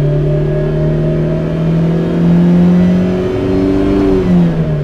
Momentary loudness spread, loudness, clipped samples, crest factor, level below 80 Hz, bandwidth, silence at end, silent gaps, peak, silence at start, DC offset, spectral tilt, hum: 5 LU; -12 LUFS; under 0.1%; 8 dB; -26 dBFS; 6.4 kHz; 0 s; none; -4 dBFS; 0 s; under 0.1%; -9.5 dB/octave; none